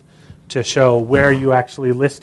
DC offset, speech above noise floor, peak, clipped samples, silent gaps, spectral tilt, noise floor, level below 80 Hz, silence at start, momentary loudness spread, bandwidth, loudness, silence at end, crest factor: under 0.1%; 29 dB; 0 dBFS; under 0.1%; none; -5.5 dB/octave; -43 dBFS; -44 dBFS; 0.3 s; 8 LU; 11.5 kHz; -15 LUFS; 0.05 s; 16 dB